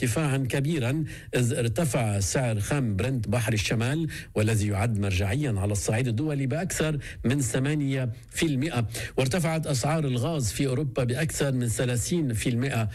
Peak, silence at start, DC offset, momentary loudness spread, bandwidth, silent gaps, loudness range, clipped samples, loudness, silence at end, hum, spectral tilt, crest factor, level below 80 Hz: -16 dBFS; 0 s; under 0.1%; 3 LU; 15.5 kHz; none; 1 LU; under 0.1%; -27 LUFS; 0 s; none; -5.5 dB/octave; 10 dB; -46 dBFS